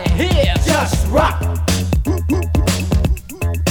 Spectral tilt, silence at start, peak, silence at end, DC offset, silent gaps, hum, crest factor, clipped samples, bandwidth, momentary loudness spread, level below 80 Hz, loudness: -5.5 dB/octave; 0 s; -2 dBFS; 0 s; 0.7%; none; none; 14 dB; under 0.1%; 20 kHz; 5 LU; -20 dBFS; -17 LUFS